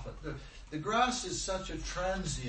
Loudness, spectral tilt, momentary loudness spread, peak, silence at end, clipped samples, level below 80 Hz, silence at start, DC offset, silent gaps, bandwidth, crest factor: -35 LUFS; -3.5 dB/octave; 14 LU; -16 dBFS; 0 s; under 0.1%; -46 dBFS; 0 s; under 0.1%; none; 8.8 kHz; 20 dB